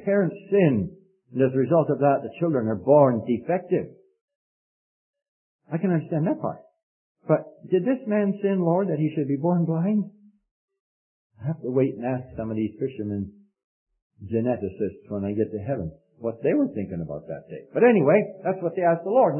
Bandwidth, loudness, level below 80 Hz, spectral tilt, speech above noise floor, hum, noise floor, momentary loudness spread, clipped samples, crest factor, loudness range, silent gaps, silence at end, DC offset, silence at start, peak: 3.2 kHz; -24 LUFS; -62 dBFS; -13 dB/octave; over 67 dB; none; under -90 dBFS; 13 LU; under 0.1%; 20 dB; 7 LU; 4.21-4.28 s, 4.35-5.14 s, 5.28-5.59 s, 6.83-7.15 s, 10.51-10.68 s, 10.80-11.30 s, 13.64-13.86 s, 14.02-14.10 s; 0 s; under 0.1%; 0 s; -4 dBFS